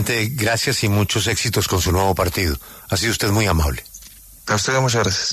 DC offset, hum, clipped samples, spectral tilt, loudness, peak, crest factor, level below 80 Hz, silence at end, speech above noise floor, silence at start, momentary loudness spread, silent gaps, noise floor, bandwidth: under 0.1%; none; under 0.1%; -4 dB/octave; -19 LUFS; -4 dBFS; 14 dB; -34 dBFS; 0 s; 23 dB; 0 s; 8 LU; none; -42 dBFS; 14 kHz